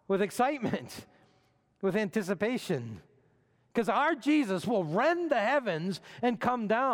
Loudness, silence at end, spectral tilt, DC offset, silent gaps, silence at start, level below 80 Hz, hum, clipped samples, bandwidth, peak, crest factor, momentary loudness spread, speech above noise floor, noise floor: -30 LUFS; 0 s; -6 dB/octave; under 0.1%; none; 0.1 s; -72 dBFS; none; under 0.1%; 18 kHz; -14 dBFS; 16 dB; 9 LU; 39 dB; -69 dBFS